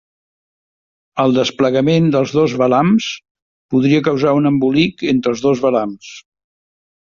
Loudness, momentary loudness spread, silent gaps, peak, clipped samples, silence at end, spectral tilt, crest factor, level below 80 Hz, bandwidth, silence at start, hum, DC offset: -15 LUFS; 12 LU; 3.31-3.35 s, 3.42-3.69 s; -2 dBFS; under 0.1%; 0.9 s; -6.5 dB/octave; 14 dB; -52 dBFS; 7.2 kHz; 1.15 s; none; under 0.1%